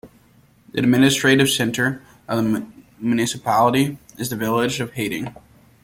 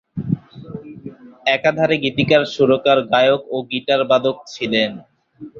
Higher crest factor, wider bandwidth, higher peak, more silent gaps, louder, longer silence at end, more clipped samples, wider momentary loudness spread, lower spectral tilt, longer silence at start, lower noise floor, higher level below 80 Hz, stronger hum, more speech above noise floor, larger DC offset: about the same, 18 dB vs 16 dB; first, 17 kHz vs 7.4 kHz; about the same, -4 dBFS vs -2 dBFS; neither; second, -20 LUFS vs -17 LUFS; first, 0.5 s vs 0 s; neither; second, 14 LU vs 20 LU; second, -4.5 dB/octave vs -6 dB/octave; about the same, 0.05 s vs 0.15 s; first, -54 dBFS vs -39 dBFS; about the same, -56 dBFS vs -56 dBFS; neither; first, 35 dB vs 23 dB; neither